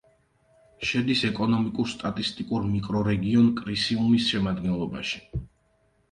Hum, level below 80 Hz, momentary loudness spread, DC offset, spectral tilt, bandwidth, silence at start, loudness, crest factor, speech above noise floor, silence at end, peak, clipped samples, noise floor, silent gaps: none; -48 dBFS; 9 LU; under 0.1%; -6 dB/octave; 10 kHz; 0.8 s; -25 LUFS; 16 dB; 42 dB; 0.65 s; -10 dBFS; under 0.1%; -66 dBFS; none